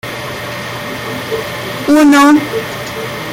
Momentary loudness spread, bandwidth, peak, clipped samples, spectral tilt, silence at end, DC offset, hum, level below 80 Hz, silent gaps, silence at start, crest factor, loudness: 15 LU; 16.5 kHz; 0 dBFS; under 0.1%; -4.5 dB/octave; 0 s; under 0.1%; none; -46 dBFS; none; 0.05 s; 12 dB; -13 LUFS